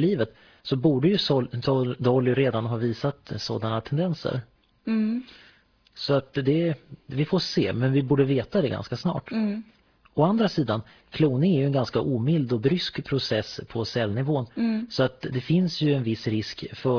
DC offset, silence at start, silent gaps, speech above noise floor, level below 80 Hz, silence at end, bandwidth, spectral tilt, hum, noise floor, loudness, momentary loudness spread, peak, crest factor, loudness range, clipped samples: under 0.1%; 0 s; none; 34 dB; -58 dBFS; 0 s; 5.4 kHz; -7.5 dB/octave; none; -59 dBFS; -25 LUFS; 9 LU; -8 dBFS; 16 dB; 4 LU; under 0.1%